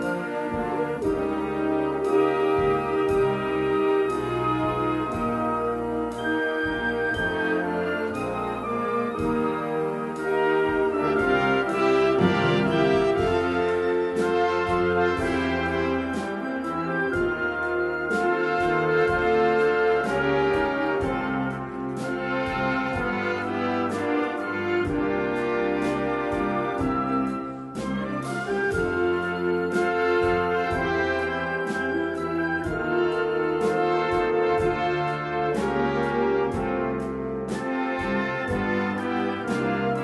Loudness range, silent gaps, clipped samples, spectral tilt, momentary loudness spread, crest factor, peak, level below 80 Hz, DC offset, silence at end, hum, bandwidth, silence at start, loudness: 4 LU; none; under 0.1%; -6.5 dB/octave; 6 LU; 16 dB; -8 dBFS; -48 dBFS; under 0.1%; 0 s; none; 11.5 kHz; 0 s; -25 LUFS